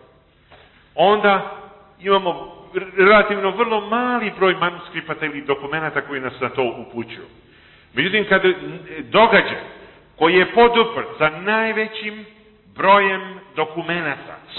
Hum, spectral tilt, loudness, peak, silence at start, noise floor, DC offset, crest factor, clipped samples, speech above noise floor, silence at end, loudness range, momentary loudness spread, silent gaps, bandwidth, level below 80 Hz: none; -10 dB/octave; -18 LUFS; -2 dBFS; 0.95 s; -53 dBFS; under 0.1%; 18 dB; under 0.1%; 34 dB; 0 s; 6 LU; 17 LU; none; 4.3 kHz; -54 dBFS